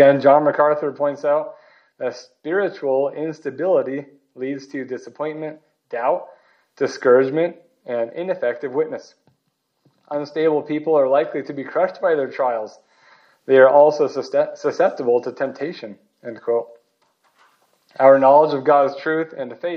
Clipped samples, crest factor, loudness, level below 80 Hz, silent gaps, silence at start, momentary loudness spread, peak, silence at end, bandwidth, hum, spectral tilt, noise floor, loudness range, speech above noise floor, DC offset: under 0.1%; 18 dB; -19 LUFS; -82 dBFS; none; 0 s; 18 LU; 0 dBFS; 0 s; 6.6 kHz; none; -6.5 dB/octave; -71 dBFS; 7 LU; 53 dB; under 0.1%